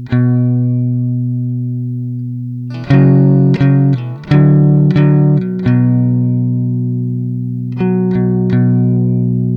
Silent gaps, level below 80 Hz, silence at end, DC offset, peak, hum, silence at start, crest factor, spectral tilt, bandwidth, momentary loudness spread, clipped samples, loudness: none; -42 dBFS; 0 s; under 0.1%; 0 dBFS; none; 0 s; 12 dB; -11 dB/octave; 5.2 kHz; 11 LU; under 0.1%; -13 LUFS